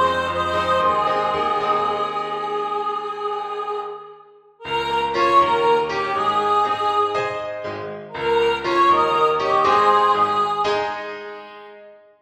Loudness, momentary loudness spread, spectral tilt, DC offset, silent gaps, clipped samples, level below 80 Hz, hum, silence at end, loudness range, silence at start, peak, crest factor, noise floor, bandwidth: -20 LUFS; 14 LU; -4.5 dB/octave; under 0.1%; none; under 0.1%; -54 dBFS; none; 0.3 s; 6 LU; 0 s; -4 dBFS; 16 dB; -47 dBFS; 13.5 kHz